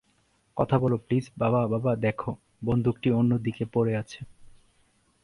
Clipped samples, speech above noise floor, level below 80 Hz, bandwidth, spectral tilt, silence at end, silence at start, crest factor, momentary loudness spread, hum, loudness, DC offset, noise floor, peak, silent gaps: under 0.1%; 42 dB; -54 dBFS; 11 kHz; -9 dB/octave; 0.75 s; 0.55 s; 18 dB; 12 LU; none; -27 LUFS; under 0.1%; -68 dBFS; -8 dBFS; none